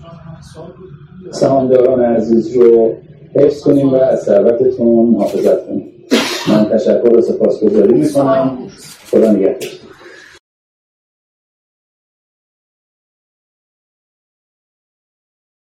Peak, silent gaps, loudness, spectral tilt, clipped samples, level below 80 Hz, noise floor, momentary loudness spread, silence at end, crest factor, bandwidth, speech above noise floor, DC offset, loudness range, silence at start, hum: 0 dBFS; none; -12 LUFS; -6.5 dB/octave; under 0.1%; -52 dBFS; -38 dBFS; 11 LU; 5.7 s; 14 dB; 15 kHz; 26 dB; under 0.1%; 7 LU; 0 s; none